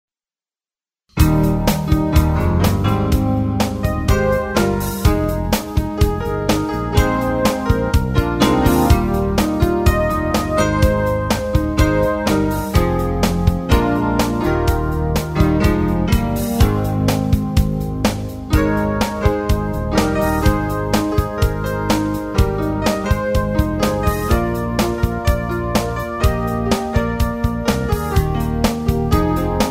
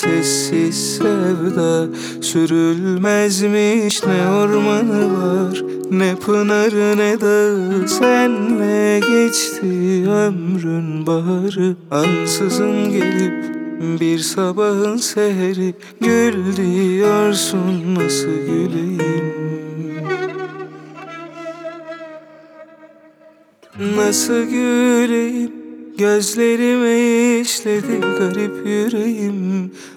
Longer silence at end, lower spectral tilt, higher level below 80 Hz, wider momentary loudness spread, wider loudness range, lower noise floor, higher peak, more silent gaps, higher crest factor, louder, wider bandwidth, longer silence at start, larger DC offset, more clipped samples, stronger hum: about the same, 0 s vs 0 s; first, -6.5 dB/octave vs -5 dB/octave; first, -24 dBFS vs -68 dBFS; second, 4 LU vs 10 LU; second, 2 LU vs 8 LU; first, under -90 dBFS vs -48 dBFS; about the same, 0 dBFS vs 0 dBFS; neither; about the same, 16 dB vs 16 dB; about the same, -18 LUFS vs -17 LUFS; second, 16.5 kHz vs 18.5 kHz; first, 1.15 s vs 0 s; neither; neither; neither